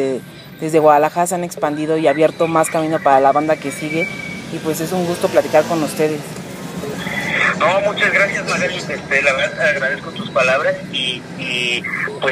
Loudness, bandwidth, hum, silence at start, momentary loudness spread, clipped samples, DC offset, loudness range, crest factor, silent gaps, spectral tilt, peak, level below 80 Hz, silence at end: -17 LUFS; 15.5 kHz; none; 0 s; 11 LU; under 0.1%; under 0.1%; 4 LU; 18 dB; none; -4 dB/octave; 0 dBFS; -54 dBFS; 0 s